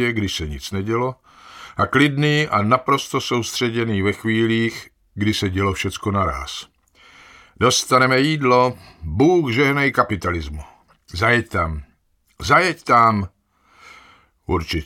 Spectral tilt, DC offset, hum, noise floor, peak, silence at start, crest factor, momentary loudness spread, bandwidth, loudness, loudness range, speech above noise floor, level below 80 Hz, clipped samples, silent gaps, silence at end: -5 dB/octave; under 0.1%; none; -62 dBFS; 0 dBFS; 0 s; 20 dB; 15 LU; 17 kHz; -19 LUFS; 4 LU; 43 dB; -40 dBFS; under 0.1%; none; 0 s